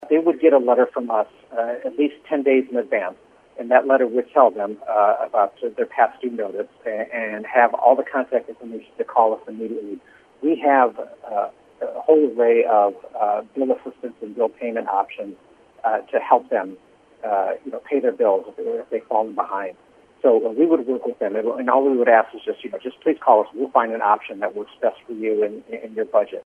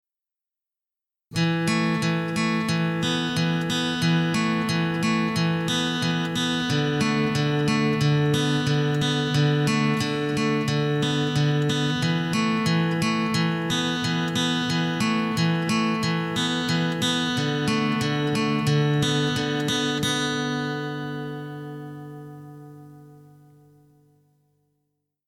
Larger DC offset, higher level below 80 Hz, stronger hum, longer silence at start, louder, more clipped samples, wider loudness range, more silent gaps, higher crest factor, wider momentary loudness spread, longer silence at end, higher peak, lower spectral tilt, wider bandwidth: neither; second, -72 dBFS vs -56 dBFS; second, none vs 50 Hz at -55 dBFS; second, 0 s vs 1.3 s; first, -20 LUFS vs -23 LUFS; neither; about the same, 4 LU vs 5 LU; neither; first, 20 dB vs 14 dB; first, 14 LU vs 5 LU; second, 0.05 s vs 2.1 s; first, 0 dBFS vs -10 dBFS; first, -7 dB/octave vs -5 dB/octave; second, 3.6 kHz vs 15.5 kHz